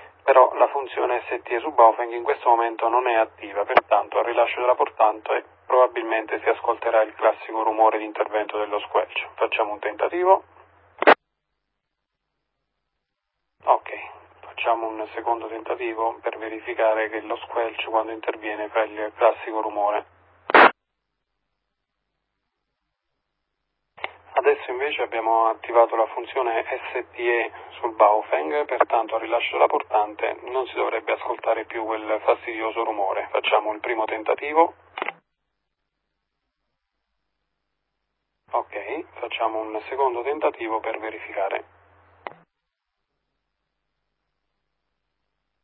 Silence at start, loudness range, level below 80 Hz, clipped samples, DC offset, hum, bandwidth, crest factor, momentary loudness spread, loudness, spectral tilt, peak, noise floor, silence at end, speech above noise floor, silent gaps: 0 s; 9 LU; -68 dBFS; under 0.1%; under 0.1%; none; 5.4 kHz; 24 dB; 12 LU; -23 LUFS; -7 dB/octave; 0 dBFS; -81 dBFS; 3.35 s; 58 dB; none